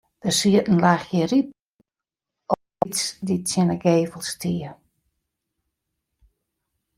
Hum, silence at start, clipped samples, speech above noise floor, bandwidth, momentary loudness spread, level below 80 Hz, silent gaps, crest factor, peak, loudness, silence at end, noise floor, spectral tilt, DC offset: none; 0.25 s; under 0.1%; 68 dB; 16 kHz; 10 LU; -60 dBFS; 1.62-1.78 s; 22 dB; -2 dBFS; -22 LUFS; 2.25 s; -89 dBFS; -5 dB/octave; under 0.1%